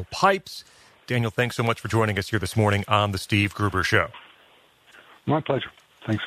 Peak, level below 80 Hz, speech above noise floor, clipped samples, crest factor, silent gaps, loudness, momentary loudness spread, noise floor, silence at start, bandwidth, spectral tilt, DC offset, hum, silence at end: -2 dBFS; -52 dBFS; 33 dB; under 0.1%; 24 dB; none; -24 LUFS; 10 LU; -57 dBFS; 0 s; 14 kHz; -5.5 dB/octave; under 0.1%; none; 0 s